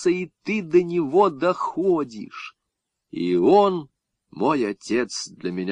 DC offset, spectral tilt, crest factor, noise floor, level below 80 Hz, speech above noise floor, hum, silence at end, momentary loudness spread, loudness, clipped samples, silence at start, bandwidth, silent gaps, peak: under 0.1%; -5.5 dB/octave; 18 dB; -81 dBFS; -68 dBFS; 59 dB; none; 0 s; 16 LU; -22 LUFS; under 0.1%; 0 s; 9.8 kHz; none; -4 dBFS